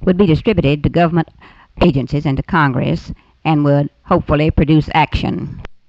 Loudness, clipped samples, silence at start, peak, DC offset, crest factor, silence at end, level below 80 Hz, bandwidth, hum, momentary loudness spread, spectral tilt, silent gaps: -15 LUFS; under 0.1%; 0 s; -2 dBFS; under 0.1%; 12 dB; 0.15 s; -30 dBFS; 7.2 kHz; none; 9 LU; -9 dB/octave; none